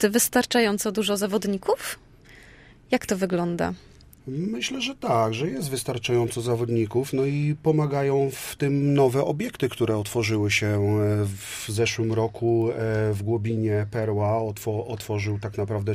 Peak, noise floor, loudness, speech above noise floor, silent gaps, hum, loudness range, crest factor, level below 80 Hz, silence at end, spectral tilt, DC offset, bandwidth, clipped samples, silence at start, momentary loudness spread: -8 dBFS; -50 dBFS; -25 LUFS; 26 dB; none; none; 4 LU; 18 dB; -54 dBFS; 0 s; -5.5 dB/octave; under 0.1%; 15.5 kHz; under 0.1%; 0 s; 8 LU